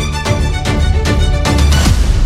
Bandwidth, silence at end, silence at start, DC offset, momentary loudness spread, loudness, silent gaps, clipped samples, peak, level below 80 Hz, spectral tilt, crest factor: 14.5 kHz; 0 s; 0 s; under 0.1%; 4 LU; -13 LUFS; none; under 0.1%; 0 dBFS; -14 dBFS; -5 dB/octave; 10 dB